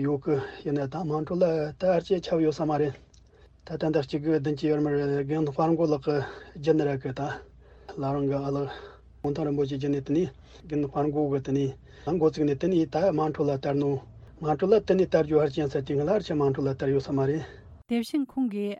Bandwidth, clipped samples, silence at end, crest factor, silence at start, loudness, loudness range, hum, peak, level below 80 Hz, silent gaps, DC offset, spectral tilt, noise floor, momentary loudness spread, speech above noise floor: 12 kHz; under 0.1%; 0 s; 18 dB; 0 s; -27 LUFS; 4 LU; none; -8 dBFS; -54 dBFS; none; under 0.1%; -8 dB/octave; -55 dBFS; 9 LU; 29 dB